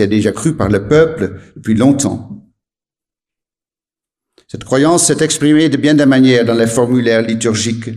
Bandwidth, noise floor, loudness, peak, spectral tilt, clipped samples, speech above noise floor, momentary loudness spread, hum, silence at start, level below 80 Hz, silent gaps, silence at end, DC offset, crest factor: 14 kHz; under -90 dBFS; -12 LUFS; 0 dBFS; -5 dB/octave; under 0.1%; over 78 dB; 10 LU; none; 0 s; -44 dBFS; none; 0 s; under 0.1%; 14 dB